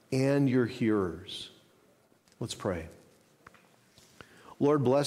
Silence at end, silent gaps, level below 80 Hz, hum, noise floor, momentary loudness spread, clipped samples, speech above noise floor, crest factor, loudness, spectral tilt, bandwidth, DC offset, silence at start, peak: 0 s; none; -62 dBFS; none; -65 dBFS; 17 LU; under 0.1%; 37 dB; 16 dB; -30 LUFS; -6.5 dB/octave; 14 kHz; under 0.1%; 0.1 s; -14 dBFS